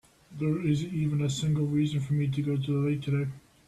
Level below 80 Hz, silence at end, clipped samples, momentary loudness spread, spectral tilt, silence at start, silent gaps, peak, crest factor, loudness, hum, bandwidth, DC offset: -58 dBFS; 0.3 s; under 0.1%; 4 LU; -7 dB/octave; 0.3 s; none; -16 dBFS; 12 dB; -29 LUFS; none; 11.5 kHz; under 0.1%